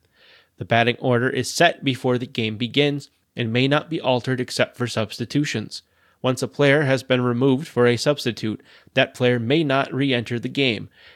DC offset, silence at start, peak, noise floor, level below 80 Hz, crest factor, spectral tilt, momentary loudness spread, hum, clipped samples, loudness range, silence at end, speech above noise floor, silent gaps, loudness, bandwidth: under 0.1%; 0.6 s; -4 dBFS; -54 dBFS; -66 dBFS; 18 dB; -5.5 dB/octave; 10 LU; none; under 0.1%; 3 LU; 0.3 s; 33 dB; none; -21 LUFS; 14.5 kHz